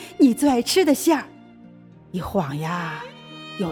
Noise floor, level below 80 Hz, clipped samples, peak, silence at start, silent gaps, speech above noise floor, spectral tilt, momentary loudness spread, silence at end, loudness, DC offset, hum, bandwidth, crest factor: -46 dBFS; -52 dBFS; under 0.1%; -6 dBFS; 0 s; none; 26 dB; -4.5 dB/octave; 19 LU; 0 s; -21 LUFS; under 0.1%; none; 19 kHz; 16 dB